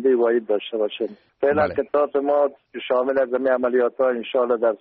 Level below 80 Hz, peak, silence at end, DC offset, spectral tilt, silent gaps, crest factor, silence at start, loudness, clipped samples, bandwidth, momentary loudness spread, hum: -62 dBFS; -8 dBFS; 0.05 s; under 0.1%; -3.5 dB/octave; none; 12 dB; 0 s; -21 LUFS; under 0.1%; 4.8 kHz; 6 LU; none